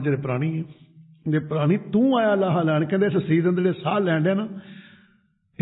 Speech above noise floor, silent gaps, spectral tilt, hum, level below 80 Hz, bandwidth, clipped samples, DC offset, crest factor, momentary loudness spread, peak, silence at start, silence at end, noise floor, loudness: 41 dB; none; -12.5 dB/octave; none; -64 dBFS; 4.1 kHz; under 0.1%; under 0.1%; 14 dB; 11 LU; -8 dBFS; 0 s; 0.8 s; -63 dBFS; -22 LUFS